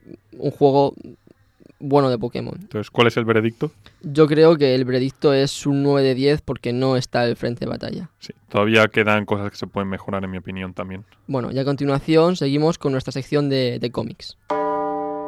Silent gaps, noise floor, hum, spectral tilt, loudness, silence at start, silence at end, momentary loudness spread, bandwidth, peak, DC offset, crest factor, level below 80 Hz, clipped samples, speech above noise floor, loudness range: none; -53 dBFS; none; -6.5 dB/octave; -20 LUFS; 0.35 s; 0 s; 13 LU; 13 kHz; -2 dBFS; under 0.1%; 20 dB; -52 dBFS; under 0.1%; 34 dB; 4 LU